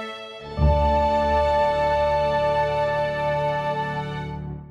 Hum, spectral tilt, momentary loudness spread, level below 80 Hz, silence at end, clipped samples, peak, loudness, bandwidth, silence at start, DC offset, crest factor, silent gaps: none; -7 dB/octave; 12 LU; -32 dBFS; 0 s; under 0.1%; -8 dBFS; -22 LUFS; 10.5 kHz; 0 s; under 0.1%; 14 dB; none